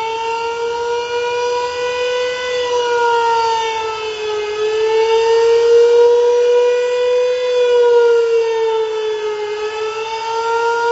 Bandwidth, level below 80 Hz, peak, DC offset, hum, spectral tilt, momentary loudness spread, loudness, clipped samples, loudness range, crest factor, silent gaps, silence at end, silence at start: 8 kHz; -56 dBFS; -2 dBFS; under 0.1%; none; 1 dB/octave; 10 LU; -15 LUFS; under 0.1%; 5 LU; 12 dB; none; 0 s; 0 s